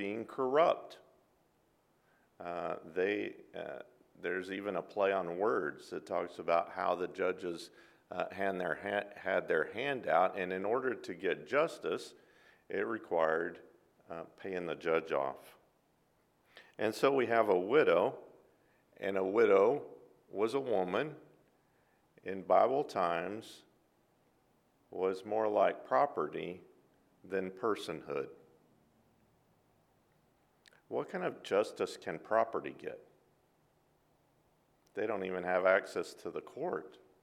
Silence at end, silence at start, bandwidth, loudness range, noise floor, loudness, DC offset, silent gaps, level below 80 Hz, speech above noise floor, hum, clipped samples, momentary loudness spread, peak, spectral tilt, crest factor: 0.3 s; 0 s; 14 kHz; 8 LU; -73 dBFS; -34 LUFS; under 0.1%; none; -80 dBFS; 39 dB; none; under 0.1%; 16 LU; -14 dBFS; -5.5 dB/octave; 22 dB